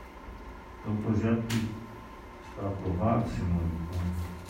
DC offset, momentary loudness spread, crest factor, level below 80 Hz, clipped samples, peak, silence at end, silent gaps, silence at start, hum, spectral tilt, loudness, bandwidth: under 0.1%; 18 LU; 16 dB; -46 dBFS; under 0.1%; -14 dBFS; 0 s; none; 0 s; none; -7.5 dB/octave; -31 LUFS; 16 kHz